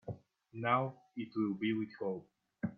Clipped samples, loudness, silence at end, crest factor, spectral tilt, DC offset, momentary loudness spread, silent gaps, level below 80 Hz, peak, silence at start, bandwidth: under 0.1%; -37 LUFS; 0 s; 22 dB; -9 dB/octave; under 0.1%; 15 LU; none; -76 dBFS; -18 dBFS; 0.05 s; 4.7 kHz